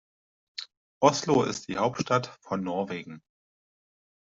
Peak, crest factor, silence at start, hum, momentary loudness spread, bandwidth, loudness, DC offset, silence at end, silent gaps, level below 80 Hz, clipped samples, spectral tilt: -4 dBFS; 24 dB; 0.6 s; none; 17 LU; 8 kHz; -27 LUFS; under 0.1%; 1.1 s; 0.77-1.01 s; -66 dBFS; under 0.1%; -5 dB/octave